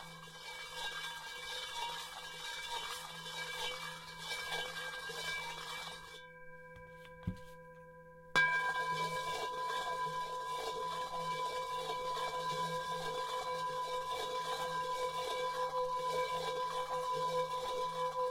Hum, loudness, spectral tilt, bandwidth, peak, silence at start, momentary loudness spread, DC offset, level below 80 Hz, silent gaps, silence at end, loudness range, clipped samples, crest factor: none; -39 LUFS; -2 dB/octave; 16.5 kHz; -16 dBFS; 0 s; 12 LU; under 0.1%; -66 dBFS; none; 0 s; 6 LU; under 0.1%; 24 dB